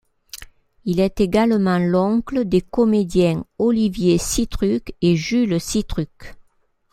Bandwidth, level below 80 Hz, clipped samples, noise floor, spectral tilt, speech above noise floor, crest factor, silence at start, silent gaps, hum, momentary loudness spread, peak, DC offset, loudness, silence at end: 15.5 kHz; -38 dBFS; under 0.1%; -62 dBFS; -6 dB/octave; 43 dB; 16 dB; 0.35 s; none; none; 11 LU; -4 dBFS; under 0.1%; -19 LUFS; 0.5 s